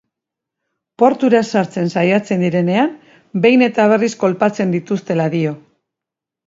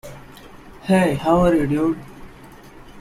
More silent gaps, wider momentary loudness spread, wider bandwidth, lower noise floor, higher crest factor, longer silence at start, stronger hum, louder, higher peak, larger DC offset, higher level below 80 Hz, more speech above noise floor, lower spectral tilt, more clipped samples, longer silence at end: neither; second, 8 LU vs 20 LU; second, 7.8 kHz vs 15 kHz; first, -85 dBFS vs -42 dBFS; about the same, 16 dB vs 16 dB; first, 1 s vs 0.05 s; neither; first, -16 LUFS vs -19 LUFS; first, 0 dBFS vs -6 dBFS; neither; second, -62 dBFS vs -40 dBFS; first, 70 dB vs 25 dB; about the same, -6.5 dB/octave vs -7 dB/octave; neither; first, 0.9 s vs 0 s